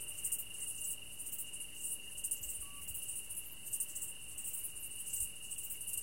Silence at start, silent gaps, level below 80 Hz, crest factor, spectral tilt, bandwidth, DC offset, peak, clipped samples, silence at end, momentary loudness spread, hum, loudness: 0 s; none; -64 dBFS; 20 dB; 0.5 dB/octave; 17 kHz; 0.3%; -24 dBFS; under 0.1%; 0 s; 5 LU; none; -40 LUFS